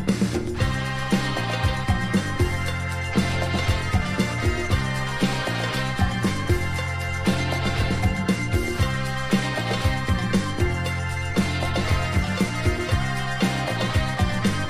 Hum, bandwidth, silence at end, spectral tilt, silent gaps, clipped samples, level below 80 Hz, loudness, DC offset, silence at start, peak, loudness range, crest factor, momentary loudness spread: none; 15.5 kHz; 0 s; -5.5 dB/octave; none; under 0.1%; -32 dBFS; -24 LUFS; under 0.1%; 0 s; -8 dBFS; 1 LU; 16 dB; 2 LU